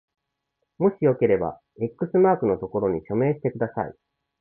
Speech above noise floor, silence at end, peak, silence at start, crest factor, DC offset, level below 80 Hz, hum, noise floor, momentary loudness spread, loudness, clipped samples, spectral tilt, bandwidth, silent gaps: 55 dB; 0.5 s; -8 dBFS; 0.8 s; 16 dB; under 0.1%; -56 dBFS; none; -78 dBFS; 12 LU; -24 LUFS; under 0.1%; -13 dB/octave; 3.2 kHz; none